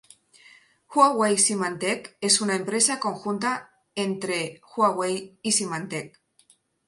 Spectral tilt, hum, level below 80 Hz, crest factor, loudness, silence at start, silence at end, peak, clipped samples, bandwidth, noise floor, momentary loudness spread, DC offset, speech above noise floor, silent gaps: -2.5 dB/octave; none; -74 dBFS; 22 dB; -24 LUFS; 0.9 s; 0.8 s; -4 dBFS; under 0.1%; 11.5 kHz; -62 dBFS; 12 LU; under 0.1%; 37 dB; none